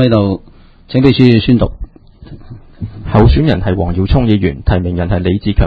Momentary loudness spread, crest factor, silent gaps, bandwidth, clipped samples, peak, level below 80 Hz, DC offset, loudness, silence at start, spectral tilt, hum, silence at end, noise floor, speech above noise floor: 16 LU; 12 dB; none; 5.2 kHz; 0.5%; 0 dBFS; -20 dBFS; under 0.1%; -12 LUFS; 0 s; -9.5 dB/octave; none; 0 s; -35 dBFS; 25 dB